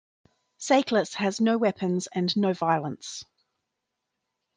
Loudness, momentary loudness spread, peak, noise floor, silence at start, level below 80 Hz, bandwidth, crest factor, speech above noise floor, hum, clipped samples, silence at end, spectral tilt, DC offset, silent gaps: -25 LUFS; 14 LU; -8 dBFS; -83 dBFS; 0.6 s; -74 dBFS; 10 kHz; 18 dB; 58 dB; none; under 0.1%; 1.35 s; -5 dB/octave; under 0.1%; none